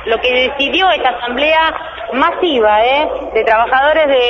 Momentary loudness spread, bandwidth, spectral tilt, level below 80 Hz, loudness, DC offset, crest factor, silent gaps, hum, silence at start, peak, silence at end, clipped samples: 5 LU; 6.8 kHz; -4.5 dB/octave; -40 dBFS; -12 LUFS; under 0.1%; 12 dB; none; none; 0 s; 0 dBFS; 0 s; under 0.1%